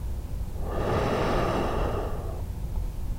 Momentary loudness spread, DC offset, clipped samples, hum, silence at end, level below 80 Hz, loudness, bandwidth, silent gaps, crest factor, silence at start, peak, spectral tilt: 9 LU; under 0.1%; under 0.1%; none; 0 s; -32 dBFS; -30 LUFS; 16 kHz; none; 14 dB; 0 s; -14 dBFS; -6.5 dB/octave